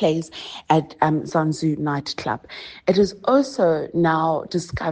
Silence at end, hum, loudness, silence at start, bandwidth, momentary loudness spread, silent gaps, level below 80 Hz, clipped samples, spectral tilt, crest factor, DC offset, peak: 0 s; none; -21 LUFS; 0 s; 9.6 kHz; 9 LU; none; -52 dBFS; under 0.1%; -6 dB/octave; 20 dB; under 0.1%; -2 dBFS